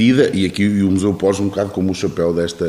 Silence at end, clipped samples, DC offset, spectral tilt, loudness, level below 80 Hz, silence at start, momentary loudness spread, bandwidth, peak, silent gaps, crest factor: 0 s; under 0.1%; under 0.1%; -6 dB/octave; -17 LUFS; -46 dBFS; 0 s; 5 LU; 13.5 kHz; 0 dBFS; none; 16 dB